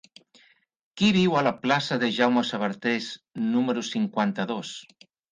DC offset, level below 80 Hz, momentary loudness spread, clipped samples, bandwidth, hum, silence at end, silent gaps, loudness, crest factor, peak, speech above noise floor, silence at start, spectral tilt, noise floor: under 0.1%; -66 dBFS; 9 LU; under 0.1%; 9.6 kHz; none; 0.5 s; none; -25 LUFS; 20 dB; -6 dBFS; 36 dB; 0.95 s; -5.5 dB/octave; -61 dBFS